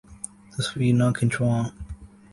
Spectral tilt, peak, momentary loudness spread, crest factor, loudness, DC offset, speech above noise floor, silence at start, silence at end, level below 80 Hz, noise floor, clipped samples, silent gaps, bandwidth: -6 dB/octave; -10 dBFS; 20 LU; 16 dB; -24 LUFS; under 0.1%; 20 dB; 0.1 s; 0.25 s; -46 dBFS; -42 dBFS; under 0.1%; none; 11.5 kHz